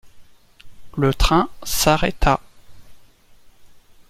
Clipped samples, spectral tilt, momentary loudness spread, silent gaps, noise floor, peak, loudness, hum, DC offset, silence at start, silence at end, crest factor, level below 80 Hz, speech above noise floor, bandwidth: under 0.1%; -4.5 dB/octave; 7 LU; none; -48 dBFS; 0 dBFS; -19 LUFS; none; under 0.1%; 0.05 s; 0.45 s; 22 dB; -30 dBFS; 30 dB; 16.5 kHz